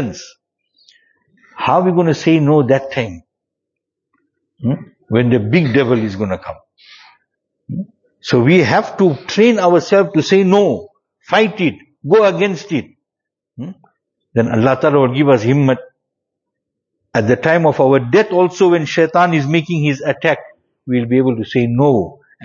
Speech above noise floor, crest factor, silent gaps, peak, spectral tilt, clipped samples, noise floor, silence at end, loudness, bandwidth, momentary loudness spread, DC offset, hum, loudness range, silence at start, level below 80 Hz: 70 dB; 16 dB; none; 0 dBFS; -7 dB/octave; under 0.1%; -83 dBFS; 0.3 s; -14 LUFS; 7.4 kHz; 13 LU; under 0.1%; none; 5 LU; 0 s; -54 dBFS